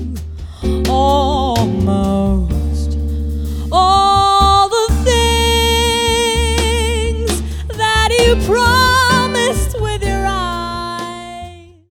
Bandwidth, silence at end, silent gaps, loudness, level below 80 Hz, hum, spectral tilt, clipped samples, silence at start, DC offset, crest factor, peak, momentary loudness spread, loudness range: 17.5 kHz; 0.3 s; none; -14 LUFS; -20 dBFS; none; -4 dB/octave; under 0.1%; 0 s; under 0.1%; 14 dB; 0 dBFS; 13 LU; 4 LU